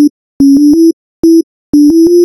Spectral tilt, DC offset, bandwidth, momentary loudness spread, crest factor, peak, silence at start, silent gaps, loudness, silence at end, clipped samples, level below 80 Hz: -6.5 dB/octave; under 0.1%; 12 kHz; 7 LU; 6 dB; 0 dBFS; 0 s; 0.10-0.40 s, 0.93-1.23 s, 1.43-1.73 s; -7 LUFS; 0 s; under 0.1%; -42 dBFS